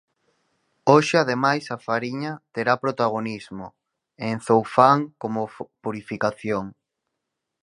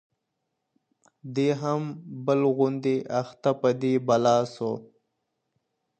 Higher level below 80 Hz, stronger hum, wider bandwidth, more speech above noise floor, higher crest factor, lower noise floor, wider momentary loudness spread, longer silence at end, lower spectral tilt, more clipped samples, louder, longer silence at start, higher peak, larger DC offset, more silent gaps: first, -64 dBFS vs -74 dBFS; neither; first, 11.5 kHz vs 8.8 kHz; about the same, 59 dB vs 56 dB; about the same, 22 dB vs 18 dB; about the same, -81 dBFS vs -80 dBFS; first, 16 LU vs 10 LU; second, 0.95 s vs 1.15 s; about the same, -6 dB/octave vs -7 dB/octave; neither; first, -23 LUFS vs -26 LUFS; second, 0.85 s vs 1.25 s; first, 0 dBFS vs -10 dBFS; neither; neither